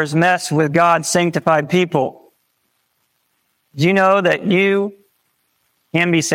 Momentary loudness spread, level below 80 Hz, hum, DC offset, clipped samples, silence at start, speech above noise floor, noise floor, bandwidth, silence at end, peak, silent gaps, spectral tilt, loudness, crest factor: 7 LU; -62 dBFS; none; under 0.1%; under 0.1%; 0 s; 51 dB; -67 dBFS; 16.5 kHz; 0 s; -2 dBFS; none; -5 dB/octave; -16 LUFS; 16 dB